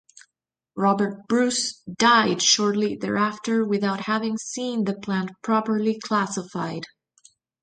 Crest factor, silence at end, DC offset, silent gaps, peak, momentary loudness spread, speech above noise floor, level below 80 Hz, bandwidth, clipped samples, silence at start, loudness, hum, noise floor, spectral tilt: 20 dB; 0.75 s; under 0.1%; none; -4 dBFS; 11 LU; 59 dB; -66 dBFS; 9.4 kHz; under 0.1%; 0.75 s; -23 LUFS; none; -82 dBFS; -3.5 dB/octave